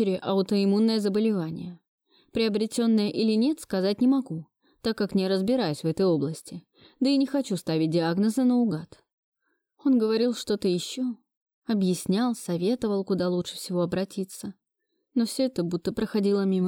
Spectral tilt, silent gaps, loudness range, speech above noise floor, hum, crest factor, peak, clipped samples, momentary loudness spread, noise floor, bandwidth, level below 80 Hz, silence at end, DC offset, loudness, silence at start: -6 dB/octave; 1.88-1.98 s, 9.13-9.32 s, 11.37-11.46 s, 11.54-11.62 s; 3 LU; 54 dB; none; 12 dB; -14 dBFS; under 0.1%; 11 LU; -79 dBFS; 17 kHz; -62 dBFS; 0 s; under 0.1%; -26 LUFS; 0 s